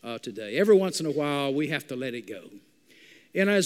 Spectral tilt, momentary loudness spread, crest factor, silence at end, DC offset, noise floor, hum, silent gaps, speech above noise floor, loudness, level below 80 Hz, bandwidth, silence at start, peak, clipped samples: -5 dB/octave; 16 LU; 18 dB; 0 s; under 0.1%; -56 dBFS; none; none; 30 dB; -26 LUFS; -80 dBFS; 16 kHz; 0.05 s; -10 dBFS; under 0.1%